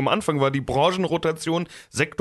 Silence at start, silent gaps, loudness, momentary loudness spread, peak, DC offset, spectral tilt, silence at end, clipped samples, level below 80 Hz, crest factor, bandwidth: 0 s; none; -23 LUFS; 5 LU; -6 dBFS; under 0.1%; -5 dB/octave; 0.1 s; under 0.1%; -52 dBFS; 16 dB; 12.5 kHz